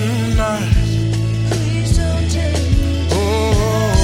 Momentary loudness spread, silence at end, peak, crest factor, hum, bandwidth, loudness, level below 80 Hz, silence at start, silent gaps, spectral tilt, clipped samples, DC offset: 2 LU; 0 s; -2 dBFS; 14 dB; none; 16 kHz; -17 LUFS; -22 dBFS; 0 s; none; -6 dB/octave; under 0.1%; under 0.1%